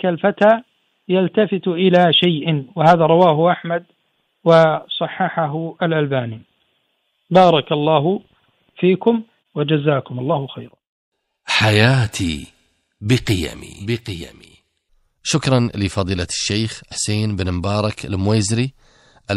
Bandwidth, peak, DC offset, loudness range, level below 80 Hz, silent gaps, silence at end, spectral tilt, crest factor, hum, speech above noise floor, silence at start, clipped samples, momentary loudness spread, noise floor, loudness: 13.5 kHz; 0 dBFS; under 0.1%; 6 LU; -46 dBFS; 10.89-11.12 s; 0 s; -5.5 dB/octave; 18 dB; none; 51 dB; 0.05 s; under 0.1%; 13 LU; -67 dBFS; -17 LUFS